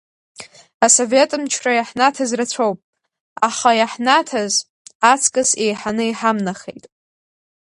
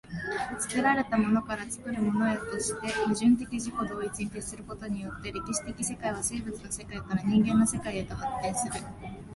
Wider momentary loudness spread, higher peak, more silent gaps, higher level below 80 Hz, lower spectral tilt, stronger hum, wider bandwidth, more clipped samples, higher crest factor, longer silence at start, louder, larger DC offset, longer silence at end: second, 8 LU vs 12 LU; first, 0 dBFS vs -12 dBFS; first, 0.74-0.80 s, 2.84-2.93 s, 3.20-3.36 s, 4.70-4.85 s, 4.95-5.00 s vs none; second, -64 dBFS vs -52 dBFS; second, -2 dB/octave vs -4.5 dB/octave; neither; about the same, 11.5 kHz vs 12 kHz; neither; about the same, 18 dB vs 16 dB; first, 0.4 s vs 0.05 s; first, -17 LUFS vs -30 LUFS; neither; first, 0.95 s vs 0 s